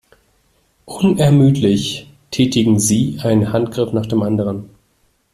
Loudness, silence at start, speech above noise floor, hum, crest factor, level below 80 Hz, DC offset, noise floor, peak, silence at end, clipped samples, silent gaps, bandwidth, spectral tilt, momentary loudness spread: -16 LUFS; 0.85 s; 46 dB; none; 14 dB; -48 dBFS; under 0.1%; -61 dBFS; -2 dBFS; 0.65 s; under 0.1%; none; 15 kHz; -6 dB/octave; 12 LU